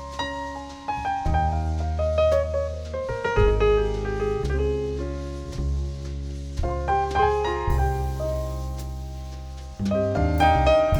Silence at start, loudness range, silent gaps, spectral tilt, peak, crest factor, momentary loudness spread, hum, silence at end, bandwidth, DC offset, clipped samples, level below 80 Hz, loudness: 0 s; 3 LU; none; -6.5 dB/octave; -6 dBFS; 18 dB; 13 LU; none; 0 s; 17.5 kHz; under 0.1%; under 0.1%; -30 dBFS; -25 LUFS